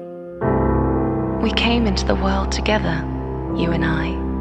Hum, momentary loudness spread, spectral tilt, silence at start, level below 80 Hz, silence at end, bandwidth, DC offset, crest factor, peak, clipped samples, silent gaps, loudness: none; 7 LU; -6 dB/octave; 0 s; -26 dBFS; 0 s; 8.6 kHz; under 0.1%; 18 dB; -2 dBFS; under 0.1%; none; -20 LUFS